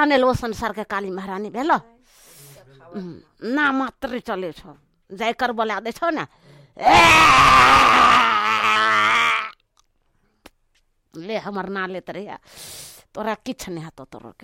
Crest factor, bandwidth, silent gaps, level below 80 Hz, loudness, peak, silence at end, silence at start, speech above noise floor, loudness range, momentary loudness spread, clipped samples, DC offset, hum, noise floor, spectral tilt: 16 dB; 16.5 kHz; none; -44 dBFS; -17 LUFS; -4 dBFS; 0.15 s; 0 s; 46 dB; 17 LU; 25 LU; under 0.1%; under 0.1%; none; -65 dBFS; -3 dB/octave